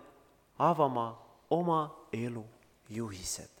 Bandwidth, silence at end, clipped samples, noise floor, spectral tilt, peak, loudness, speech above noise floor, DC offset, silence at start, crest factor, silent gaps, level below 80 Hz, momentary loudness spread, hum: 19 kHz; 0.15 s; under 0.1%; -63 dBFS; -5.5 dB/octave; -12 dBFS; -33 LUFS; 30 dB; under 0.1%; 0 s; 22 dB; none; -64 dBFS; 16 LU; none